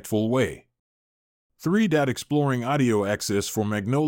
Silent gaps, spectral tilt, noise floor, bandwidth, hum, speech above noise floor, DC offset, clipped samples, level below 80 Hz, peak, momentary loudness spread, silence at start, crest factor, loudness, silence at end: 0.79-1.50 s; -5.5 dB/octave; under -90 dBFS; 17 kHz; none; over 67 dB; under 0.1%; under 0.1%; -58 dBFS; -8 dBFS; 5 LU; 0.05 s; 16 dB; -24 LUFS; 0 s